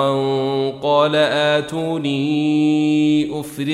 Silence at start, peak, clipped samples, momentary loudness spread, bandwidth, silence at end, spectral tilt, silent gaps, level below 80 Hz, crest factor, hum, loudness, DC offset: 0 s; -4 dBFS; under 0.1%; 6 LU; 13.5 kHz; 0 s; -6 dB/octave; none; -60 dBFS; 14 dB; none; -18 LUFS; under 0.1%